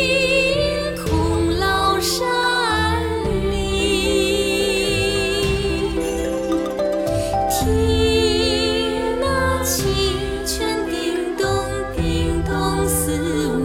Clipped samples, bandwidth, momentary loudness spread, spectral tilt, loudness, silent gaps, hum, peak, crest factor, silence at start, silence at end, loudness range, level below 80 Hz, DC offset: under 0.1%; 17.5 kHz; 5 LU; -4 dB/octave; -19 LUFS; none; none; -6 dBFS; 14 dB; 0 s; 0 s; 2 LU; -30 dBFS; under 0.1%